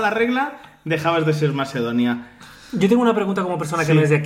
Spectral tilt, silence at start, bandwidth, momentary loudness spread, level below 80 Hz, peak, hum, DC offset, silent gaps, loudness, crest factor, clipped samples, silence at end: -6.5 dB/octave; 0 s; 15 kHz; 10 LU; -58 dBFS; -6 dBFS; none; under 0.1%; none; -20 LUFS; 14 dB; under 0.1%; 0 s